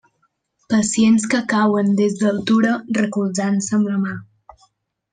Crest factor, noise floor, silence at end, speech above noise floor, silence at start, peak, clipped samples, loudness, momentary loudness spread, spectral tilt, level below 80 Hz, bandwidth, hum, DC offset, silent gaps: 16 dB; -67 dBFS; 0.9 s; 50 dB; 0.7 s; -4 dBFS; under 0.1%; -18 LUFS; 6 LU; -5 dB/octave; -58 dBFS; 9.6 kHz; none; under 0.1%; none